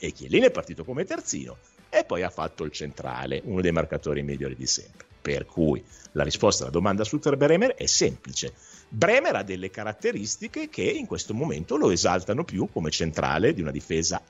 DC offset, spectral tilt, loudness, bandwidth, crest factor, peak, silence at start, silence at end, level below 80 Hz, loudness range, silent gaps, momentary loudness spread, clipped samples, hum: under 0.1%; -4 dB/octave; -26 LUFS; 8.4 kHz; 20 dB; -6 dBFS; 0 s; 0.1 s; -48 dBFS; 5 LU; none; 12 LU; under 0.1%; none